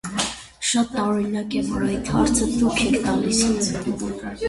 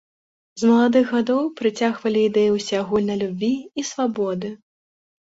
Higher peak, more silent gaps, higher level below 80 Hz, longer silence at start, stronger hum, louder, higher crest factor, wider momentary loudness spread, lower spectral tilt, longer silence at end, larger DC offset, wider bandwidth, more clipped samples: about the same, -6 dBFS vs -6 dBFS; neither; first, -40 dBFS vs -62 dBFS; second, 0.05 s vs 0.55 s; neither; about the same, -22 LUFS vs -21 LUFS; about the same, 16 dB vs 16 dB; about the same, 7 LU vs 9 LU; second, -4 dB/octave vs -5.5 dB/octave; second, 0 s vs 0.85 s; neither; first, 11.5 kHz vs 8 kHz; neither